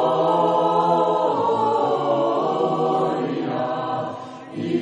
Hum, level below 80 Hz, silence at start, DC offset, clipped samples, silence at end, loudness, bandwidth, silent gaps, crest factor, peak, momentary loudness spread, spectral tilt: none; -70 dBFS; 0 s; under 0.1%; under 0.1%; 0 s; -21 LUFS; 10.5 kHz; none; 14 dB; -6 dBFS; 9 LU; -7 dB/octave